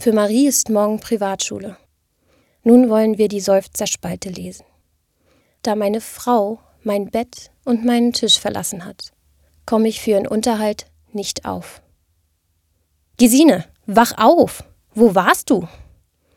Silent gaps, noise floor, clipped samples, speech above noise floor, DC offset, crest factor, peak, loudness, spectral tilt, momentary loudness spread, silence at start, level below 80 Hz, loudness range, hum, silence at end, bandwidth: none; -65 dBFS; under 0.1%; 49 dB; under 0.1%; 18 dB; 0 dBFS; -17 LUFS; -4 dB/octave; 18 LU; 0 s; -52 dBFS; 8 LU; none; 0.7 s; 17 kHz